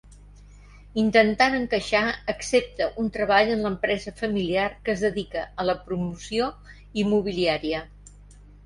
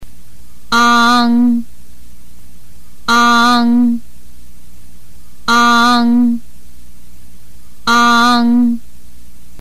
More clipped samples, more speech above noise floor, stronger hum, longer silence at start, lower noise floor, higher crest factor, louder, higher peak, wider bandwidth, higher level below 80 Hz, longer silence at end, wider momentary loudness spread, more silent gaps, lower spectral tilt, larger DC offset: neither; second, 24 dB vs 32 dB; second, 50 Hz at -45 dBFS vs 60 Hz at -30 dBFS; about the same, 0.05 s vs 0 s; first, -48 dBFS vs -43 dBFS; first, 20 dB vs 10 dB; second, -24 LUFS vs -11 LUFS; about the same, -6 dBFS vs -4 dBFS; second, 11.5 kHz vs 15.5 kHz; about the same, -48 dBFS vs -44 dBFS; second, 0.2 s vs 0.8 s; second, 10 LU vs 13 LU; neither; first, -5 dB/octave vs -3 dB/octave; second, under 0.1% vs 9%